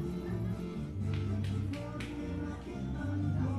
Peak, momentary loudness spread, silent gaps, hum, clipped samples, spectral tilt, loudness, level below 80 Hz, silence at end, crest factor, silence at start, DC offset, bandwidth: -22 dBFS; 5 LU; none; none; under 0.1%; -8 dB/octave; -37 LUFS; -48 dBFS; 0 s; 12 dB; 0 s; under 0.1%; 11.5 kHz